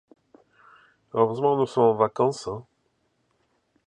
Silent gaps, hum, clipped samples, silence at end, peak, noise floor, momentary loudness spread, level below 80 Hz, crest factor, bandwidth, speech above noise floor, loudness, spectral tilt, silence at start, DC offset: none; none; under 0.1%; 1.25 s; -6 dBFS; -71 dBFS; 13 LU; -66 dBFS; 20 dB; 9.8 kHz; 48 dB; -24 LUFS; -7 dB/octave; 1.15 s; under 0.1%